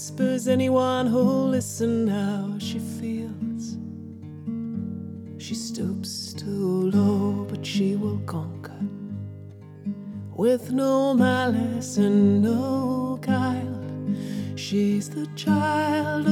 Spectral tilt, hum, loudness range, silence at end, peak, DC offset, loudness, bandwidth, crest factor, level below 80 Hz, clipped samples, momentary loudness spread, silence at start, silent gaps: -6 dB/octave; none; 9 LU; 0 s; -10 dBFS; under 0.1%; -25 LUFS; 15 kHz; 16 dB; -68 dBFS; under 0.1%; 15 LU; 0 s; none